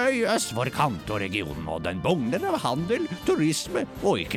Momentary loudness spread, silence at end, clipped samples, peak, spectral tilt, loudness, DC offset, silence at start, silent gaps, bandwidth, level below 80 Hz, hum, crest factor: 6 LU; 0 s; under 0.1%; -10 dBFS; -4.5 dB/octave; -26 LUFS; under 0.1%; 0 s; none; 17.5 kHz; -50 dBFS; none; 16 dB